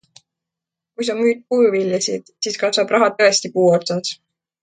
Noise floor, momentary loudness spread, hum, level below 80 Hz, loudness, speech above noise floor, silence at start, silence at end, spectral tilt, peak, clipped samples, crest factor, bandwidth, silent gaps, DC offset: -85 dBFS; 10 LU; none; -68 dBFS; -18 LUFS; 68 dB; 1 s; 0.5 s; -3.5 dB/octave; -2 dBFS; under 0.1%; 18 dB; 9.4 kHz; none; under 0.1%